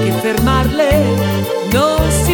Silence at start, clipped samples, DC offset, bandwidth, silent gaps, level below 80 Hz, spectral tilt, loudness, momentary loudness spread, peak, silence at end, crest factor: 0 s; under 0.1%; under 0.1%; 19.5 kHz; none; -24 dBFS; -5.5 dB/octave; -14 LUFS; 3 LU; -2 dBFS; 0 s; 12 dB